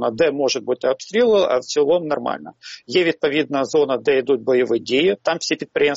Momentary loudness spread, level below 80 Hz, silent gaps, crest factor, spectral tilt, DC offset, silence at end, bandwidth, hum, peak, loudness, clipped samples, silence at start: 6 LU; -62 dBFS; none; 14 dB; -2.5 dB/octave; under 0.1%; 0 s; 8 kHz; none; -4 dBFS; -19 LUFS; under 0.1%; 0 s